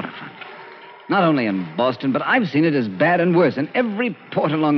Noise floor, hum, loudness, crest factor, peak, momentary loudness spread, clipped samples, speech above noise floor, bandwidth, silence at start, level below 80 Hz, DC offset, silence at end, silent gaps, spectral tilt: -40 dBFS; none; -19 LUFS; 14 dB; -4 dBFS; 19 LU; under 0.1%; 22 dB; 6 kHz; 0 s; -72 dBFS; under 0.1%; 0 s; none; -5 dB/octave